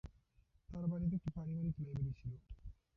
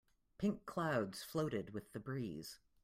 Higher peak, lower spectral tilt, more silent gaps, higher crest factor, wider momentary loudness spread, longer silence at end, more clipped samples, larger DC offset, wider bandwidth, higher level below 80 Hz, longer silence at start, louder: second, -28 dBFS vs -24 dBFS; first, -11.5 dB/octave vs -6 dB/octave; neither; about the same, 14 dB vs 18 dB; first, 17 LU vs 10 LU; about the same, 0.25 s vs 0.3 s; neither; neither; second, 5.6 kHz vs 16 kHz; first, -56 dBFS vs -72 dBFS; second, 0.05 s vs 0.4 s; about the same, -43 LUFS vs -42 LUFS